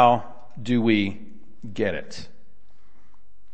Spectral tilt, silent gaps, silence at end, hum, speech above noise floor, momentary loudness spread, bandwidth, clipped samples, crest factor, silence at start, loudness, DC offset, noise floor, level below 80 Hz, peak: -6.5 dB/octave; none; 1.3 s; none; 40 dB; 23 LU; 8.6 kHz; under 0.1%; 22 dB; 0 s; -24 LUFS; 3%; -62 dBFS; -60 dBFS; -4 dBFS